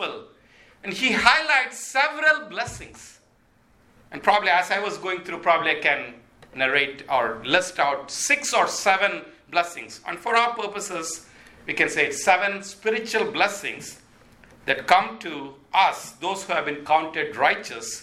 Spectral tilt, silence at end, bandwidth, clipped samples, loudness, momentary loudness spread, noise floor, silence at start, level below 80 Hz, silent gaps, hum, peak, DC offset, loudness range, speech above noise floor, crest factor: -1.5 dB/octave; 0 s; 16.5 kHz; under 0.1%; -22 LUFS; 14 LU; -60 dBFS; 0 s; -60 dBFS; none; none; 0 dBFS; under 0.1%; 3 LU; 37 dB; 24 dB